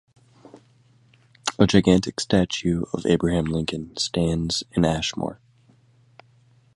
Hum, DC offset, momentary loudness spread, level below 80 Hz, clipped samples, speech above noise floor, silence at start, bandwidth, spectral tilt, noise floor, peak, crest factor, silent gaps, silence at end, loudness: none; under 0.1%; 11 LU; -44 dBFS; under 0.1%; 36 dB; 0.55 s; 11.5 kHz; -5.5 dB/octave; -58 dBFS; 0 dBFS; 24 dB; none; 1.4 s; -23 LUFS